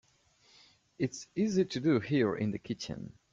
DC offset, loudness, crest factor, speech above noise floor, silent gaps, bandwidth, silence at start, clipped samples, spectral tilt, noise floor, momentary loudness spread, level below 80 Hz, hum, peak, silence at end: under 0.1%; -32 LUFS; 18 dB; 35 dB; none; 7.8 kHz; 1 s; under 0.1%; -6 dB/octave; -67 dBFS; 10 LU; -66 dBFS; none; -16 dBFS; 0.2 s